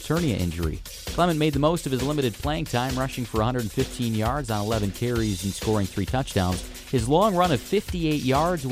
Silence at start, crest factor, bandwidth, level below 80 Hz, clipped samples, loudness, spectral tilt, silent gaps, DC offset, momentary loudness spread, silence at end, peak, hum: 0 s; 16 dB; 16 kHz; -38 dBFS; under 0.1%; -25 LUFS; -5.5 dB/octave; none; under 0.1%; 6 LU; 0 s; -8 dBFS; none